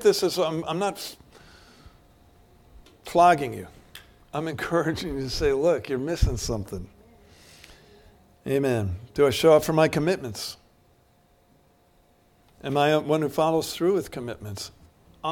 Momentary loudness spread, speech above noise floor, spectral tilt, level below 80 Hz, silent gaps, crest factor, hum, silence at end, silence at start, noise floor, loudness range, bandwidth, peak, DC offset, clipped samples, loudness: 19 LU; 37 dB; -5 dB/octave; -42 dBFS; none; 20 dB; none; 0 s; 0 s; -61 dBFS; 5 LU; 18.5 kHz; -6 dBFS; under 0.1%; under 0.1%; -24 LUFS